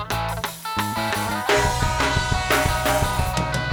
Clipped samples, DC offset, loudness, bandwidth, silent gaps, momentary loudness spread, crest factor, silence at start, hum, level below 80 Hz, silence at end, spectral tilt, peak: under 0.1%; under 0.1%; -22 LUFS; over 20 kHz; none; 6 LU; 18 dB; 0 s; none; -32 dBFS; 0 s; -4 dB/octave; -4 dBFS